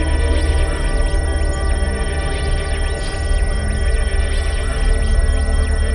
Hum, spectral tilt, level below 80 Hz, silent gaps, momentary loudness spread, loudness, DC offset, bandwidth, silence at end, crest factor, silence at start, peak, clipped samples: none; -5 dB/octave; -18 dBFS; none; 3 LU; -20 LUFS; under 0.1%; 11 kHz; 0 s; 12 dB; 0 s; -4 dBFS; under 0.1%